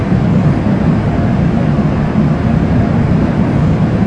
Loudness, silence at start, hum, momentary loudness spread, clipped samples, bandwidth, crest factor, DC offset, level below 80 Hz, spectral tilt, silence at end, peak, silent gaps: -12 LUFS; 0 s; none; 1 LU; under 0.1%; 8.2 kHz; 12 dB; under 0.1%; -24 dBFS; -9.5 dB/octave; 0 s; 0 dBFS; none